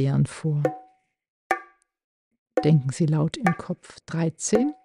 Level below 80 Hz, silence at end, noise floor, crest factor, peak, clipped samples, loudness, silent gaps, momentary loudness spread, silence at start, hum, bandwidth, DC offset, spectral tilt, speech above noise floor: -58 dBFS; 0.1 s; -56 dBFS; 18 dB; -6 dBFS; under 0.1%; -25 LUFS; 1.30-1.50 s, 2.04-2.31 s, 2.38-2.46 s; 11 LU; 0 s; none; 11 kHz; under 0.1%; -6.5 dB/octave; 33 dB